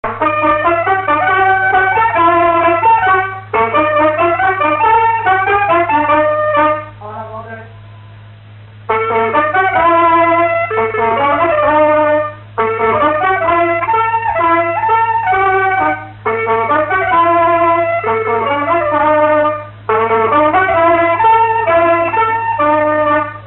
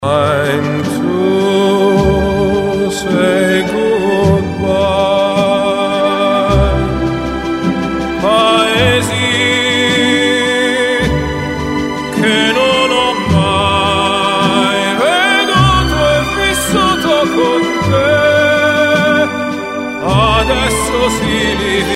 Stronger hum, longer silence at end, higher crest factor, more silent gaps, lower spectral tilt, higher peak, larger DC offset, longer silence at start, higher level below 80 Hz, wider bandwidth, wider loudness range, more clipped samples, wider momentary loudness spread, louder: neither; about the same, 0 s vs 0 s; about the same, 12 dB vs 12 dB; neither; first, -10 dB/octave vs -4.5 dB/octave; about the same, 0 dBFS vs 0 dBFS; first, 0.1% vs under 0.1%; about the same, 0.05 s vs 0 s; second, -44 dBFS vs -28 dBFS; second, 4.2 kHz vs 16 kHz; about the same, 3 LU vs 2 LU; neither; about the same, 6 LU vs 6 LU; about the same, -12 LUFS vs -12 LUFS